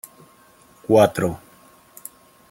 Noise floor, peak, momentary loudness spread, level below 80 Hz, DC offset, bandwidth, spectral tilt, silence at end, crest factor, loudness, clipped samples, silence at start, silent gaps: -52 dBFS; -2 dBFS; 24 LU; -58 dBFS; under 0.1%; 16.5 kHz; -6 dB/octave; 1.15 s; 20 dB; -19 LUFS; under 0.1%; 0.9 s; none